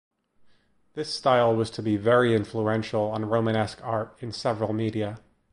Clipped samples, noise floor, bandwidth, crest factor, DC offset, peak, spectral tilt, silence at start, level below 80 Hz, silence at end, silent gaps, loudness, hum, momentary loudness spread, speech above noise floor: under 0.1%; -60 dBFS; 11 kHz; 18 dB; under 0.1%; -8 dBFS; -6.5 dB/octave; 0.95 s; -58 dBFS; 0.35 s; none; -26 LUFS; none; 12 LU; 35 dB